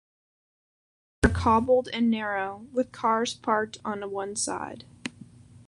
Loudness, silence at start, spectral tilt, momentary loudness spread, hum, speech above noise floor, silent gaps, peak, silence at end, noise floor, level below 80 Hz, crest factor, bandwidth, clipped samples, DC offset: -27 LUFS; 1.2 s; -4.5 dB/octave; 16 LU; none; 23 dB; none; -4 dBFS; 0.05 s; -50 dBFS; -42 dBFS; 24 dB; 11.5 kHz; under 0.1%; under 0.1%